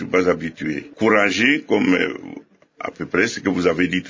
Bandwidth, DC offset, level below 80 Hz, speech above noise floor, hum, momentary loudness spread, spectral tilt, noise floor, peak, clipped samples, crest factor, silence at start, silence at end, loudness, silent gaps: 7.6 kHz; under 0.1%; -52 dBFS; 20 dB; none; 15 LU; -5 dB/octave; -40 dBFS; -2 dBFS; under 0.1%; 18 dB; 0 s; 0 s; -19 LUFS; none